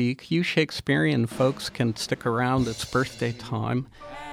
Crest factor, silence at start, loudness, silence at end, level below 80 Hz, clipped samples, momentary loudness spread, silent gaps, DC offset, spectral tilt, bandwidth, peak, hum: 16 dB; 0 s; -26 LUFS; 0 s; -50 dBFS; under 0.1%; 7 LU; none; under 0.1%; -5.5 dB/octave; 15.5 kHz; -10 dBFS; none